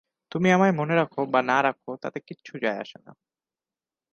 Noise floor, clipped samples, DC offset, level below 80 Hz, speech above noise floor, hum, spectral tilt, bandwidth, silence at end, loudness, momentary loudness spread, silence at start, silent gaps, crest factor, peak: under -90 dBFS; under 0.1%; under 0.1%; -70 dBFS; over 65 dB; none; -6.5 dB/octave; 7.2 kHz; 1 s; -24 LUFS; 16 LU; 0.35 s; none; 20 dB; -6 dBFS